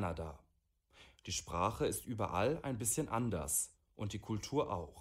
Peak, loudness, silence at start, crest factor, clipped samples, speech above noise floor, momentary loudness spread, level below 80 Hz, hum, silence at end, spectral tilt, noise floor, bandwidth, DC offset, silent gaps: -20 dBFS; -38 LUFS; 0 s; 20 dB; under 0.1%; 37 dB; 9 LU; -58 dBFS; none; 0 s; -4.5 dB/octave; -75 dBFS; 16 kHz; under 0.1%; none